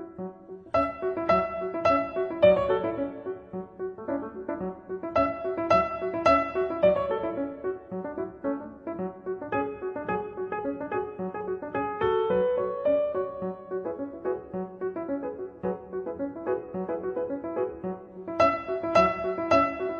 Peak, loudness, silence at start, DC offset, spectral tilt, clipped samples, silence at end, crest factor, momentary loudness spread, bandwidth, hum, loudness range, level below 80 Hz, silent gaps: -8 dBFS; -28 LUFS; 0 s; under 0.1%; -7 dB/octave; under 0.1%; 0 s; 20 dB; 13 LU; 7.4 kHz; none; 7 LU; -54 dBFS; none